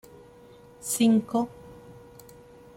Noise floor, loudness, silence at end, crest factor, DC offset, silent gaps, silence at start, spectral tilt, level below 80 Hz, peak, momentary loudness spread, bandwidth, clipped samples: -51 dBFS; -25 LUFS; 0.85 s; 18 dB; under 0.1%; none; 0.85 s; -4.5 dB/octave; -62 dBFS; -10 dBFS; 26 LU; 16.5 kHz; under 0.1%